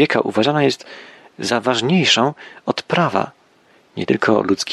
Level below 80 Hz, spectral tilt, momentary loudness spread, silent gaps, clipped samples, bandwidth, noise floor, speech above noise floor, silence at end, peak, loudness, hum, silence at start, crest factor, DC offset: -60 dBFS; -4.5 dB/octave; 14 LU; none; under 0.1%; 12.5 kHz; -54 dBFS; 36 dB; 0 s; -2 dBFS; -18 LUFS; none; 0 s; 18 dB; under 0.1%